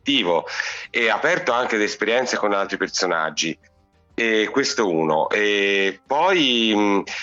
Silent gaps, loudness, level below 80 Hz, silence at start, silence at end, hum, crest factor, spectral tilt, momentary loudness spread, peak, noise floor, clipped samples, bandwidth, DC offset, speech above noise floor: none; -20 LUFS; -62 dBFS; 0.05 s; 0 s; none; 14 dB; -3 dB/octave; 7 LU; -8 dBFS; -58 dBFS; under 0.1%; 8 kHz; under 0.1%; 37 dB